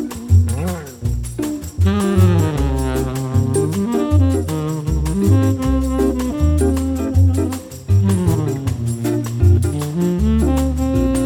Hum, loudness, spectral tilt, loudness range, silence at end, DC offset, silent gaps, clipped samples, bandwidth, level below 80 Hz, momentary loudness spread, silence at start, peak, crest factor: none; -18 LUFS; -7.5 dB/octave; 1 LU; 0 s; under 0.1%; none; under 0.1%; 17.5 kHz; -24 dBFS; 8 LU; 0 s; -2 dBFS; 14 dB